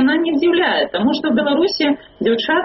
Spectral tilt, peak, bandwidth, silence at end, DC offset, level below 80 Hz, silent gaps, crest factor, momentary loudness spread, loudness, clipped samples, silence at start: -2 dB/octave; -6 dBFS; 6 kHz; 0 s; under 0.1%; -54 dBFS; none; 10 dB; 4 LU; -17 LUFS; under 0.1%; 0 s